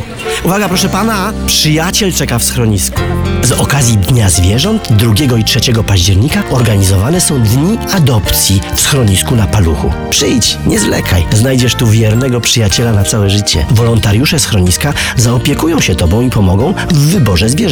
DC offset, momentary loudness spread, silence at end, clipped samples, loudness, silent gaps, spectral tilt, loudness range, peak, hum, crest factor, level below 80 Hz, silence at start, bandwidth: under 0.1%; 3 LU; 0 s; under 0.1%; -10 LUFS; none; -4.5 dB/octave; 1 LU; 0 dBFS; none; 10 dB; -24 dBFS; 0 s; over 20 kHz